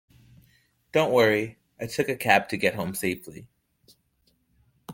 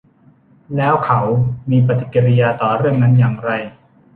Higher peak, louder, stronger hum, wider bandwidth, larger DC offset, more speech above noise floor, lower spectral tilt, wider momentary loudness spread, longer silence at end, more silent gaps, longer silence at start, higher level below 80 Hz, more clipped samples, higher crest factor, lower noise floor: about the same, -4 dBFS vs -2 dBFS; second, -25 LUFS vs -15 LUFS; neither; first, 17 kHz vs 3.8 kHz; neither; first, 44 dB vs 36 dB; second, -4.5 dB/octave vs -11 dB/octave; first, 16 LU vs 9 LU; second, 0 s vs 0.45 s; neither; first, 0.95 s vs 0.7 s; second, -64 dBFS vs -48 dBFS; neither; first, 24 dB vs 14 dB; first, -69 dBFS vs -50 dBFS